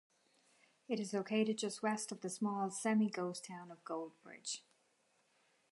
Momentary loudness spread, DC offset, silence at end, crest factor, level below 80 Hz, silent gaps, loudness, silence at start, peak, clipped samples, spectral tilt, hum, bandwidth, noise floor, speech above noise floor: 13 LU; under 0.1%; 1.1 s; 18 dB; under -90 dBFS; none; -40 LUFS; 0.9 s; -22 dBFS; under 0.1%; -4.5 dB/octave; none; 11.5 kHz; -77 dBFS; 38 dB